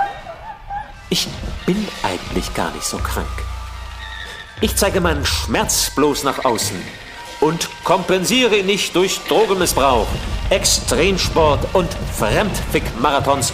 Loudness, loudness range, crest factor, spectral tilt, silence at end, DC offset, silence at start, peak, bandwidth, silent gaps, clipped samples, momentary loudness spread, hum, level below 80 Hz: -17 LUFS; 7 LU; 18 dB; -3.5 dB/octave; 0 s; under 0.1%; 0 s; -2 dBFS; 16 kHz; none; under 0.1%; 15 LU; none; -30 dBFS